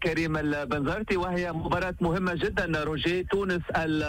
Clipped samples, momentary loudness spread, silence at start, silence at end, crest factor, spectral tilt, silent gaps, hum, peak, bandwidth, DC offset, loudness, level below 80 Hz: under 0.1%; 2 LU; 0 s; 0 s; 12 dB; -6.5 dB/octave; none; none; -16 dBFS; 16 kHz; under 0.1%; -28 LUFS; -44 dBFS